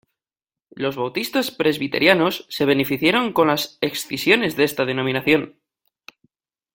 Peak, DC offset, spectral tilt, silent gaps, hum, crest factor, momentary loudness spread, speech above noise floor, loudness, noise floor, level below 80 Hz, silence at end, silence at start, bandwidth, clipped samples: 0 dBFS; under 0.1%; -4.5 dB/octave; none; none; 20 dB; 8 LU; over 70 dB; -20 LUFS; under -90 dBFS; -60 dBFS; 1.25 s; 0.75 s; 17 kHz; under 0.1%